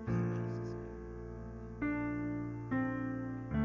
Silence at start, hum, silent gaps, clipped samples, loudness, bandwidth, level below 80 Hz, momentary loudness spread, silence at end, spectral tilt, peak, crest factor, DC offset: 0 s; none; none; under 0.1%; -39 LUFS; 7.2 kHz; -52 dBFS; 11 LU; 0 s; -9.5 dB/octave; -22 dBFS; 14 dB; under 0.1%